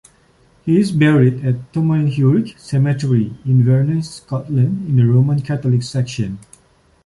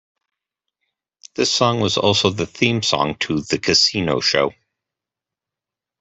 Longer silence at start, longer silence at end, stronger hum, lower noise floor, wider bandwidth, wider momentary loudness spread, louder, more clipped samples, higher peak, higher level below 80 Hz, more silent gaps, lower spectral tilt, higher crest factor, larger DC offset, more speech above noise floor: second, 0.65 s vs 1.4 s; second, 0.65 s vs 1.5 s; neither; second, -54 dBFS vs -87 dBFS; first, 11.5 kHz vs 8.4 kHz; about the same, 9 LU vs 7 LU; about the same, -16 LUFS vs -18 LUFS; neither; about the same, -2 dBFS vs -2 dBFS; about the same, -50 dBFS vs -54 dBFS; neither; first, -8 dB/octave vs -3.5 dB/octave; second, 14 dB vs 20 dB; neither; second, 39 dB vs 68 dB